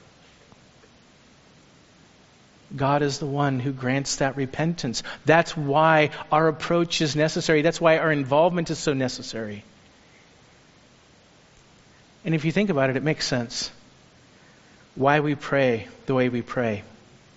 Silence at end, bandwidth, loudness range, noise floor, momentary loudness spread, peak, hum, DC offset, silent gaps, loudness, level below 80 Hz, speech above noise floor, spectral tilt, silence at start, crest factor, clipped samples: 0.5 s; 8 kHz; 10 LU; -55 dBFS; 10 LU; -2 dBFS; none; under 0.1%; none; -23 LUFS; -54 dBFS; 32 dB; -4.5 dB/octave; 2.7 s; 24 dB; under 0.1%